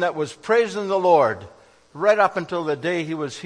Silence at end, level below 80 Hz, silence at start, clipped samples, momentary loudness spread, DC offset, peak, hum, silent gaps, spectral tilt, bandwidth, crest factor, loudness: 0 s; -66 dBFS; 0 s; under 0.1%; 9 LU; under 0.1%; -4 dBFS; none; none; -5 dB/octave; 10.5 kHz; 18 dB; -21 LUFS